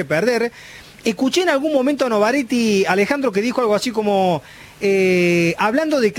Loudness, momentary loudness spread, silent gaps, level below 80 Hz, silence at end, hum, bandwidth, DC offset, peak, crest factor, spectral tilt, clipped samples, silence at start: -18 LUFS; 8 LU; none; -56 dBFS; 0 s; none; 17 kHz; under 0.1%; -2 dBFS; 16 dB; -5 dB/octave; under 0.1%; 0 s